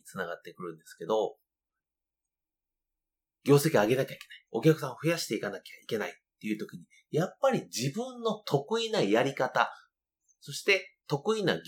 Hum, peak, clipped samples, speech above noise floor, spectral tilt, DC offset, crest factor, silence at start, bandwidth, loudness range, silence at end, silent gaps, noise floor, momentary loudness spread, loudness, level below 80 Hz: none; -8 dBFS; under 0.1%; over 60 dB; -5 dB/octave; under 0.1%; 22 dB; 0.05 s; 19 kHz; 4 LU; 0.05 s; none; under -90 dBFS; 15 LU; -30 LUFS; -78 dBFS